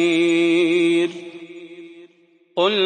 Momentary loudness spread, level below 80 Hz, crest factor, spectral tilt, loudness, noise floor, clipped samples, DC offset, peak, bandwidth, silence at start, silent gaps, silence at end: 22 LU; -76 dBFS; 14 dB; -4.5 dB/octave; -18 LUFS; -56 dBFS; under 0.1%; under 0.1%; -6 dBFS; 9.6 kHz; 0 s; none; 0 s